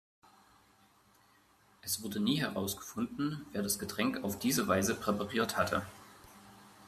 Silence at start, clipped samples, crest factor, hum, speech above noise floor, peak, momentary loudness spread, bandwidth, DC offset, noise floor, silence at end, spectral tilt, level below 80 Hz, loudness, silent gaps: 1.85 s; under 0.1%; 20 dB; none; 32 dB; -16 dBFS; 19 LU; 15 kHz; under 0.1%; -66 dBFS; 0 s; -4 dB/octave; -68 dBFS; -34 LUFS; none